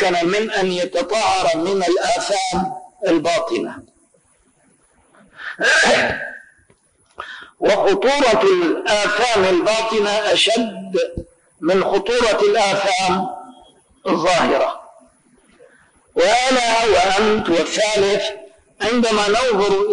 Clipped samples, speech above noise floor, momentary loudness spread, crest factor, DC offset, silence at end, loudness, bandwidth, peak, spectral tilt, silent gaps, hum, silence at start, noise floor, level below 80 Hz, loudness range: under 0.1%; 41 dB; 12 LU; 12 dB; under 0.1%; 0 s; -17 LUFS; 10.5 kHz; -6 dBFS; -3 dB/octave; none; none; 0 s; -58 dBFS; -48 dBFS; 5 LU